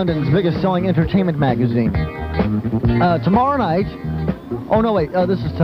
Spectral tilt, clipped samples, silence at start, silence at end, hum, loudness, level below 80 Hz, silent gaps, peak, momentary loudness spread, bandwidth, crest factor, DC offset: -9.5 dB/octave; under 0.1%; 0 s; 0 s; none; -18 LUFS; -32 dBFS; none; -2 dBFS; 7 LU; 6 kHz; 14 dB; under 0.1%